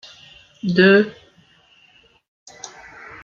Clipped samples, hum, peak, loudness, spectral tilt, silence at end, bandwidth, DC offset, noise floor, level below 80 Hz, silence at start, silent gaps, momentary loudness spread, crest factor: under 0.1%; none; 0 dBFS; -16 LUFS; -6 dB/octave; 0.55 s; 7.4 kHz; under 0.1%; -55 dBFS; -62 dBFS; 0.65 s; 2.28-2.46 s; 25 LU; 22 dB